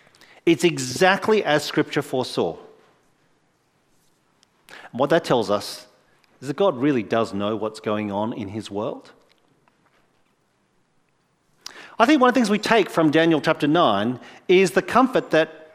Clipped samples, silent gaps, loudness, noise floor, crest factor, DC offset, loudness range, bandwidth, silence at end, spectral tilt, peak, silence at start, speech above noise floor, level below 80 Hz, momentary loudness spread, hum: under 0.1%; none; -21 LUFS; -66 dBFS; 22 dB; under 0.1%; 12 LU; 15.5 kHz; 0.1 s; -5 dB/octave; 0 dBFS; 0.45 s; 46 dB; -64 dBFS; 16 LU; none